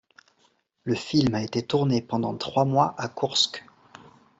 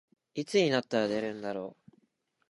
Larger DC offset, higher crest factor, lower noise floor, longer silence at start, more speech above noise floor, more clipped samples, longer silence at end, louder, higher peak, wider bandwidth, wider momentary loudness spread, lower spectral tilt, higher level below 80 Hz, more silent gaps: neither; about the same, 20 dB vs 20 dB; second, -67 dBFS vs -72 dBFS; first, 0.85 s vs 0.35 s; about the same, 42 dB vs 42 dB; neither; about the same, 0.8 s vs 0.8 s; first, -25 LUFS vs -31 LUFS; first, -6 dBFS vs -14 dBFS; second, 8.2 kHz vs 11.5 kHz; second, 7 LU vs 14 LU; about the same, -5 dB/octave vs -5 dB/octave; first, -60 dBFS vs -74 dBFS; neither